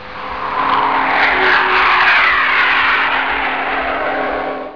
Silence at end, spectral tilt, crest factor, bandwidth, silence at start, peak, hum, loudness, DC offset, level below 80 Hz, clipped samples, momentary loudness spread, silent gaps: 0 s; -4 dB/octave; 12 dB; 5.4 kHz; 0 s; -2 dBFS; none; -13 LUFS; 1%; -42 dBFS; under 0.1%; 10 LU; none